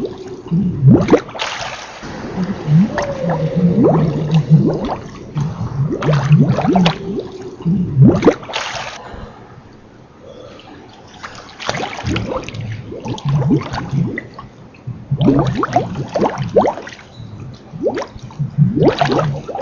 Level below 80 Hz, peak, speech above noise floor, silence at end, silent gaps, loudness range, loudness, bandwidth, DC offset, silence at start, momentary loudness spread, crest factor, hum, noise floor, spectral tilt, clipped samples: -38 dBFS; 0 dBFS; 28 dB; 0 s; none; 11 LU; -16 LUFS; 7.2 kHz; under 0.1%; 0 s; 21 LU; 16 dB; none; -41 dBFS; -7.5 dB/octave; under 0.1%